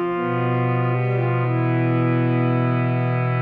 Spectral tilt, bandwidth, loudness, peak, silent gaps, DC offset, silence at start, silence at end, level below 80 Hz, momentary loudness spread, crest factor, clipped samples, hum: -11 dB/octave; 4.2 kHz; -21 LUFS; -10 dBFS; none; under 0.1%; 0 s; 0 s; -62 dBFS; 2 LU; 10 dB; under 0.1%; none